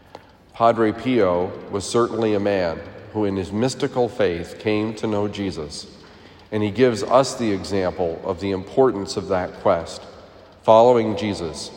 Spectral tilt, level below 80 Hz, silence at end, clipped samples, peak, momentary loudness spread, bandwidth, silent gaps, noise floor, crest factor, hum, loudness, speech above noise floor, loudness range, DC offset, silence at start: -5.5 dB/octave; -54 dBFS; 0 s; under 0.1%; 0 dBFS; 11 LU; 16 kHz; none; -45 dBFS; 20 dB; none; -21 LUFS; 25 dB; 4 LU; under 0.1%; 0.15 s